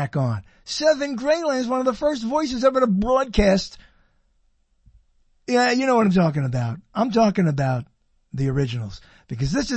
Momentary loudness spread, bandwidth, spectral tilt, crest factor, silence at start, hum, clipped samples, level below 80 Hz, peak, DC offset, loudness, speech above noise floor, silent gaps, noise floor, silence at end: 11 LU; 8.8 kHz; -6 dB/octave; 18 dB; 0 s; none; under 0.1%; -40 dBFS; -4 dBFS; under 0.1%; -21 LUFS; 43 dB; none; -64 dBFS; 0 s